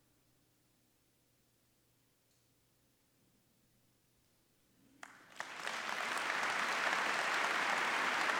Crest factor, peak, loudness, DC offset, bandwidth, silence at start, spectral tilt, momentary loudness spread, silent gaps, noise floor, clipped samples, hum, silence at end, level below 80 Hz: 22 dB; -18 dBFS; -35 LUFS; under 0.1%; over 20 kHz; 5.05 s; -0.5 dB/octave; 10 LU; none; -75 dBFS; under 0.1%; none; 0 s; -86 dBFS